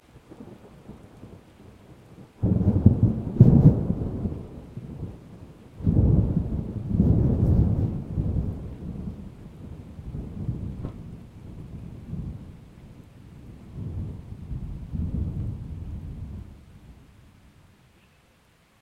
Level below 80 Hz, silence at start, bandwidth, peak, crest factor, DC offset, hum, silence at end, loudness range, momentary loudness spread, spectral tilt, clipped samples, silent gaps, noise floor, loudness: -36 dBFS; 0.15 s; 4.3 kHz; 0 dBFS; 26 dB; under 0.1%; none; 1.9 s; 17 LU; 26 LU; -11.5 dB/octave; under 0.1%; none; -60 dBFS; -25 LUFS